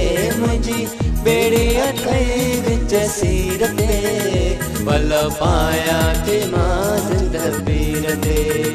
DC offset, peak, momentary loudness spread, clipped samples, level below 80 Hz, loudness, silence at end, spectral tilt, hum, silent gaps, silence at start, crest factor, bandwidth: under 0.1%; -2 dBFS; 4 LU; under 0.1%; -24 dBFS; -18 LUFS; 0 s; -5 dB/octave; none; none; 0 s; 14 dB; 14 kHz